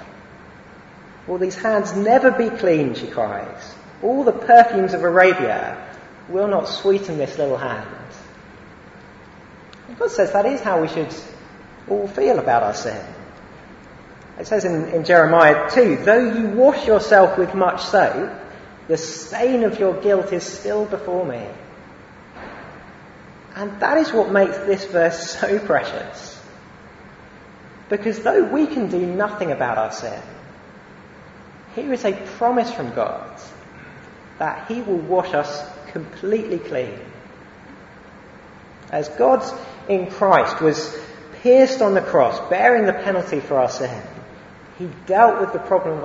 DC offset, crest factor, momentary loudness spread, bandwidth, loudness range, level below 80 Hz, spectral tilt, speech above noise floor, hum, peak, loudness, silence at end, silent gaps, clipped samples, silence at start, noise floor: under 0.1%; 20 dB; 22 LU; 8 kHz; 9 LU; -54 dBFS; -5.5 dB/octave; 25 dB; none; 0 dBFS; -18 LUFS; 0 s; none; under 0.1%; 0 s; -43 dBFS